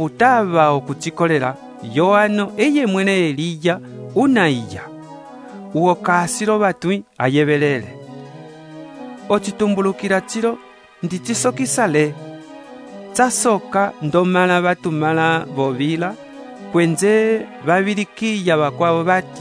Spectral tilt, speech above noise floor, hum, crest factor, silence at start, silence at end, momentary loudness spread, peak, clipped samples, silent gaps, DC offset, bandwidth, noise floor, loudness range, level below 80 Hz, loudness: -5 dB/octave; 20 dB; none; 18 dB; 0 s; 0 s; 21 LU; 0 dBFS; under 0.1%; none; under 0.1%; 11 kHz; -37 dBFS; 4 LU; -62 dBFS; -17 LUFS